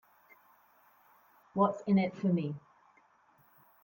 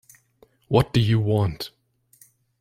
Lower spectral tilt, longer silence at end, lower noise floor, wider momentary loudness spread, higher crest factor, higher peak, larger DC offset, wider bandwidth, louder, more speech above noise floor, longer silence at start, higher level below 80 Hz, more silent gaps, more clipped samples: first, -9 dB/octave vs -7 dB/octave; first, 1.25 s vs 0.9 s; first, -66 dBFS vs -59 dBFS; about the same, 12 LU vs 14 LU; about the same, 22 dB vs 20 dB; second, -14 dBFS vs -4 dBFS; neither; about the same, 17 kHz vs 15.5 kHz; second, -31 LUFS vs -22 LUFS; about the same, 37 dB vs 39 dB; first, 1.55 s vs 0.7 s; second, -78 dBFS vs -48 dBFS; neither; neither